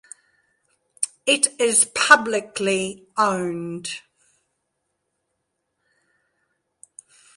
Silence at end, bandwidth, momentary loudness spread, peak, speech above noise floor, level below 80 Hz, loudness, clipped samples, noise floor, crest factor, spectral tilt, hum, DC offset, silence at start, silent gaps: 3.4 s; 12 kHz; 15 LU; 0 dBFS; 56 dB; -68 dBFS; -20 LUFS; under 0.1%; -76 dBFS; 24 dB; -1.5 dB/octave; none; under 0.1%; 1 s; none